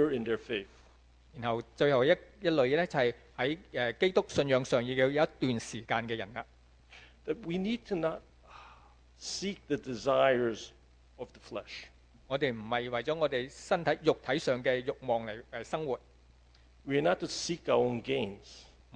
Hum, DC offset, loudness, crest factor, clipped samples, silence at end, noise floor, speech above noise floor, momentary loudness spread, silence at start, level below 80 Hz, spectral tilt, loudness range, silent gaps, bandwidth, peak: none; under 0.1%; -32 LUFS; 20 dB; under 0.1%; 0.35 s; -60 dBFS; 29 dB; 16 LU; 0 s; -60 dBFS; -5 dB/octave; 7 LU; none; 9.8 kHz; -12 dBFS